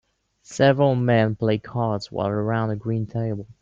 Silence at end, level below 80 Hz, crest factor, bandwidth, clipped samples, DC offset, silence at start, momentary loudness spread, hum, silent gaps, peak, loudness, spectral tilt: 0.1 s; -56 dBFS; 18 dB; 7.8 kHz; under 0.1%; under 0.1%; 0.5 s; 9 LU; none; none; -4 dBFS; -22 LUFS; -7 dB/octave